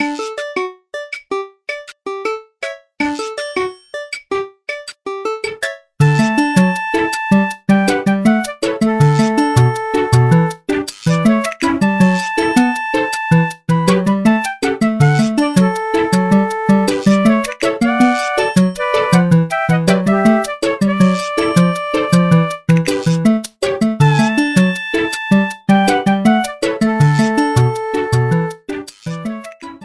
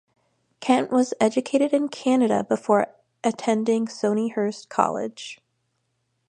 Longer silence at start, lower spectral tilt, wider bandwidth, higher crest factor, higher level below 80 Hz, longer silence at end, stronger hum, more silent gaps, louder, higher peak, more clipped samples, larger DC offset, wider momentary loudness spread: second, 0 s vs 0.6 s; first, -6.5 dB/octave vs -5 dB/octave; first, 11 kHz vs 9.8 kHz; second, 14 dB vs 20 dB; first, -48 dBFS vs -72 dBFS; second, 0 s vs 0.95 s; neither; neither; first, -15 LUFS vs -23 LUFS; first, 0 dBFS vs -4 dBFS; neither; neither; about the same, 12 LU vs 10 LU